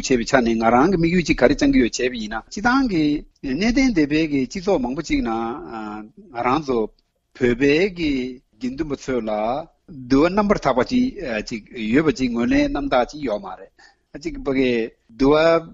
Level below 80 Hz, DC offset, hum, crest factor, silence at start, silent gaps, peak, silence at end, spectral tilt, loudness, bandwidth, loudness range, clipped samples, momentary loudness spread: -38 dBFS; under 0.1%; none; 20 dB; 0 s; none; 0 dBFS; 0 s; -5.5 dB/octave; -20 LUFS; 7.8 kHz; 4 LU; under 0.1%; 14 LU